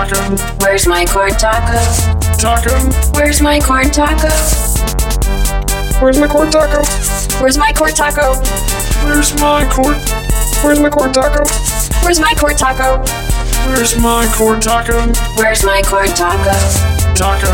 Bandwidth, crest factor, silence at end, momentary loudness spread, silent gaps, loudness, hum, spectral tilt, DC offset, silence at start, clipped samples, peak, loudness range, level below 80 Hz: 17.5 kHz; 10 dB; 0 s; 5 LU; none; -12 LUFS; none; -4 dB/octave; under 0.1%; 0 s; under 0.1%; 0 dBFS; 1 LU; -16 dBFS